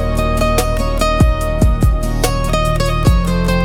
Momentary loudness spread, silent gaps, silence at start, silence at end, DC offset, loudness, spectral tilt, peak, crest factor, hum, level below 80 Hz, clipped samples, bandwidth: 3 LU; none; 0 s; 0 s; under 0.1%; -15 LUFS; -5.5 dB/octave; -2 dBFS; 12 dB; none; -16 dBFS; under 0.1%; 18 kHz